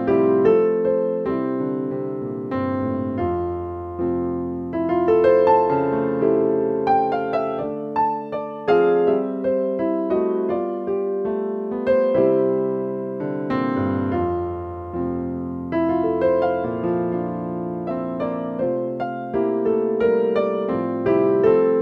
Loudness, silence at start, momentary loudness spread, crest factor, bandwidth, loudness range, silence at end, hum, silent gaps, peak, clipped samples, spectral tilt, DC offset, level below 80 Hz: -21 LUFS; 0 s; 10 LU; 16 dB; 5.4 kHz; 5 LU; 0 s; none; none; -4 dBFS; under 0.1%; -10 dB/octave; under 0.1%; -52 dBFS